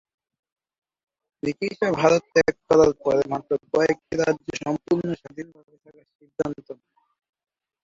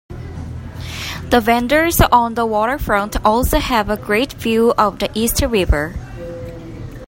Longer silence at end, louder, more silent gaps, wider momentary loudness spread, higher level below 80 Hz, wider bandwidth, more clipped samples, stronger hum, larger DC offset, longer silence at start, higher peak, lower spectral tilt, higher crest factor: first, 1.1 s vs 0 s; second, -23 LUFS vs -16 LUFS; first, 6.15-6.19 s vs none; first, 21 LU vs 17 LU; second, -56 dBFS vs -28 dBFS; second, 7.6 kHz vs 16.5 kHz; neither; neither; neither; first, 1.45 s vs 0.1 s; second, -4 dBFS vs 0 dBFS; about the same, -5.5 dB/octave vs -4.5 dB/octave; first, 22 dB vs 16 dB